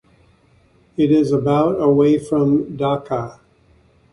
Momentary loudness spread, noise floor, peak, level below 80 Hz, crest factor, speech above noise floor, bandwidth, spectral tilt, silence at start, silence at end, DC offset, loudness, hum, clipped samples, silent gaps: 11 LU; -55 dBFS; -4 dBFS; -52 dBFS; 14 dB; 38 dB; 11 kHz; -8.5 dB/octave; 1 s; 0.8 s; under 0.1%; -17 LUFS; none; under 0.1%; none